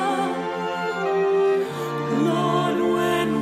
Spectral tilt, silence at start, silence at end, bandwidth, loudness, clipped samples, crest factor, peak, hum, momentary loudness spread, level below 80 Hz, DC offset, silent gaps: -6 dB/octave; 0 s; 0 s; 14.5 kHz; -22 LUFS; under 0.1%; 14 dB; -8 dBFS; none; 6 LU; -60 dBFS; under 0.1%; none